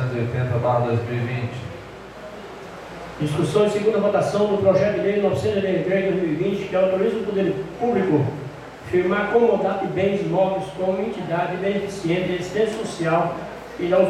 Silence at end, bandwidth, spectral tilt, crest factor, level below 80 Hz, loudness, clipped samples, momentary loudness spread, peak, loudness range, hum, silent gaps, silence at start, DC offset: 0 s; 13 kHz; -7 dB/octave; 16 dB; -52 dBFS; -22 LUFS; under 0.1%; 17 LU; -4 dBFS; 4 LU; none; none; 0 s; under 0.1%